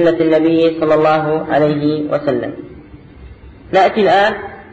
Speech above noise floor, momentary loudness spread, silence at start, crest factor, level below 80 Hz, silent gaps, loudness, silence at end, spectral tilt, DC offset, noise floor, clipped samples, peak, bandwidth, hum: 24 dB; 8 LU; 0 s; 12 dB; -44 dBFS; none; -14 LUFS; 0.1 s; -7.5 dB/octave; under 0.1%; -37 dBFS; under 0.1%; -4 dBFS; 8 kHz; none